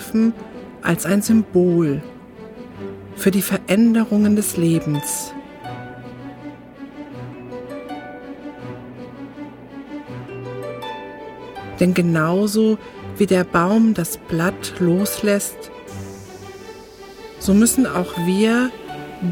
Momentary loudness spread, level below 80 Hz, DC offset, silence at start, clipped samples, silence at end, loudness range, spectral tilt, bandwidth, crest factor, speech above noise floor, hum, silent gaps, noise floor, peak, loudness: 20 LU; -50 dBFS; under 0.1%; 0 s; under 0.1%; 0 s; 15 LU; -5.5 dB/octave; 19 kHz; 18 dB; 22 dB; none; none; -39 dBFS; -2 dBFS; -18 LUFS